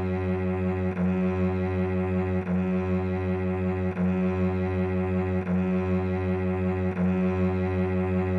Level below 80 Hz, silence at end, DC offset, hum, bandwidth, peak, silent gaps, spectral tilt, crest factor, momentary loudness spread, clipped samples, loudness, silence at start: -50 dBFS; 0 s; under 0.1%; none; 4.4 kHz; -16 dBFS; none; -10 dB/octave; 10 dB; 2 LU; under 0.1%; -27 LUFS; 0 s